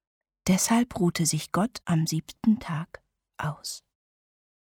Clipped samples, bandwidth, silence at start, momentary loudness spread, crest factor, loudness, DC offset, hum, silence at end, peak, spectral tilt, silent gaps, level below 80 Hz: under 0.1%; 18 kHz; 0.45 s; 12 LU; 16 dB; -27 LUFS; under 0.1%; none; 0.9 s; -12 dBFS; -4.5 dB/octave; none; -58 dBFS